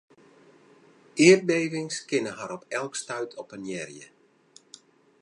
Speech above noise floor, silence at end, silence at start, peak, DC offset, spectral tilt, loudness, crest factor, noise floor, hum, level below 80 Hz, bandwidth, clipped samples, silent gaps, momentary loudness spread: 33 dB; 1.15 s; 1.15 s; -4 dBFS; under 0.1%; -4 dB/octave; -25 LUFS; 24 dB; -58 dBFS; none; -78 dBFS; 11 kHz; under 0.1%; none; 20 LU